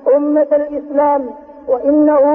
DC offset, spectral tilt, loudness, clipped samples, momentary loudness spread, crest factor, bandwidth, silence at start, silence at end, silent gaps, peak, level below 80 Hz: under 0.1%; -9.5 dB/octave; -14 LUFS; under 0.1%; 9 LU; 10 dB; 3 kHz; 0.05 s; 0 s; none; -4 dBFS; -54 dBFS